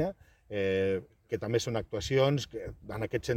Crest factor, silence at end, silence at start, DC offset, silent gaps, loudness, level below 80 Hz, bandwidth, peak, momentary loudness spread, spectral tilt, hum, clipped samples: 18 dB; 0 s; 0 s; under 0.1%; none; -32 LUFS; -54 dBFS; 16 kHz; -12 dBFS; 12 LU; -5.5 dB/octave; none; under 0.1%